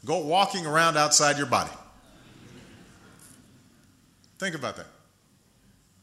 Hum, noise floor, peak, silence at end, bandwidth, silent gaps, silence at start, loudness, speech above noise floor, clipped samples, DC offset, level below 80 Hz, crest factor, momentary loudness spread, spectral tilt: none; -62 dBFS; -6 dBFS; 1.15 s; 16 kHz; none; 0.05 s; -24 LUFS; 38 dB; under 0.1%; under 0.1%; -64 dBFS; 22 dB; 17 LU; -2 dB/octave